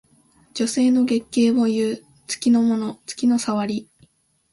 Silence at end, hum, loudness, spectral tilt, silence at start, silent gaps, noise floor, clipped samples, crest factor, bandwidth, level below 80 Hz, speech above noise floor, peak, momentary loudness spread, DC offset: 0.7 s; none; -21 LUFS; -4.5 dB/octave; 0.55 s; none; -59 dBFS; under 0.1%; 14 dB; 11.5 kHz; -62 dBFS; 39 dB; -8 dBFS; 12 LU; under 0.1%